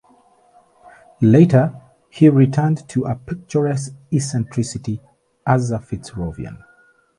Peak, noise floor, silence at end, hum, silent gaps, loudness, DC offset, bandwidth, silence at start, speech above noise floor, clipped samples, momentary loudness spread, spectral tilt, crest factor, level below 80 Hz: 0 dBFS; -54 dBFS; 0.65 s; none; none; -18 LUFS; under 0.1%; 11.5 kHz; 1.2 s; 37 dB; under 0.1%; 16 LU; -7.5 dB/octave; 18 dB; -48 dBFS